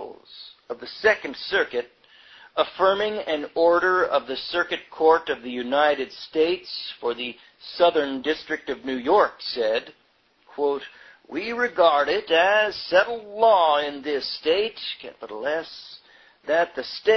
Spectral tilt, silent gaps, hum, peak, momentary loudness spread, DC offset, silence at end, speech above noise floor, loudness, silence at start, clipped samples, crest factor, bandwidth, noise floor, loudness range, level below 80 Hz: -4 dB/octave; none; none; -4 dBFS; 17 LU; under 0.1%; 0 s; 35 dB; -23 LUFS; 0 s; under 0.1%; 20 dB; 6.4 kHz; -58 dBFS; 5 LU; -62 dBFS